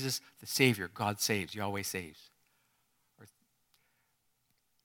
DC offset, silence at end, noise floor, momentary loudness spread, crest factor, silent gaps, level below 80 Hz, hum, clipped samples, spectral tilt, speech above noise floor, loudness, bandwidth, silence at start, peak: under 0.1%; 1.6 s; -77 dBFS; 10 LU; 28 dB; none; -74 dBFS; none; under 0.1%; -3.5 dB/octave; 43 dB; -33 LUFS; 19 kHz; 0 s; -10 dBFS